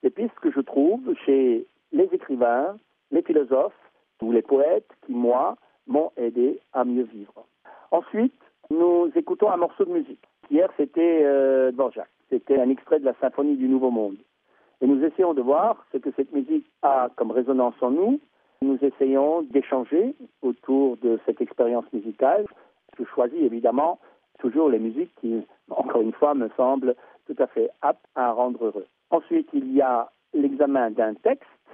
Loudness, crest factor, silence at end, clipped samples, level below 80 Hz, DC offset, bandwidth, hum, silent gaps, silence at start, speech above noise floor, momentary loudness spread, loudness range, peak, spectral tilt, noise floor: -23 LUFS; 18 dB; 0.35 s; under 0.1%; -78 dBFS; under 0.1%; 3.6 kHz; none; none; 0.05 s; 41 dB; 9 LU; 3 LU; -6 dBFS; -6 dB/octave; -63 dBFS